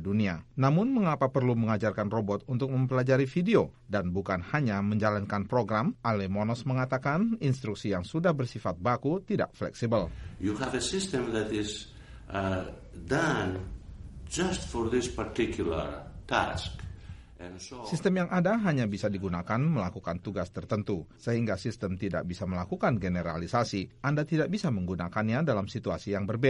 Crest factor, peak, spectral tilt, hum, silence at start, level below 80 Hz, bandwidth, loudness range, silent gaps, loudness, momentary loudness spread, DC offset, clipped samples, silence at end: 20 dB; -10 dBFS; -6.5 dB/octave; none; 0 s; -50 dBFS; 11.5 kHz; 4 LU; none; -30 LUFS; 10 LU; under 0.1%; under 0.1%; 0 s